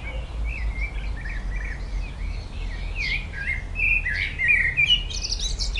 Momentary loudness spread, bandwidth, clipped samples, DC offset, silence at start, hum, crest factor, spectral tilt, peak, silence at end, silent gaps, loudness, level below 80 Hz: 15 LU; 11 kHz; under 0.1%; under 0.1%; 0 s; none; 16 dB; -2 dB/octave; -8 dBFS; 0 s; none; -24 LUFS; -30 dBFS